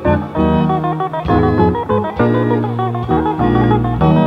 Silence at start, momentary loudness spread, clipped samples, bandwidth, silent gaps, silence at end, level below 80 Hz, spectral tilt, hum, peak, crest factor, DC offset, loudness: 0 s; 5 LU; under 0.1%; 5.6 kHz; none; 0 s; -30 dBFS; -10 dB/octave; none; 0 dBFS; 14 dB; under 0.1%; -15 LUFS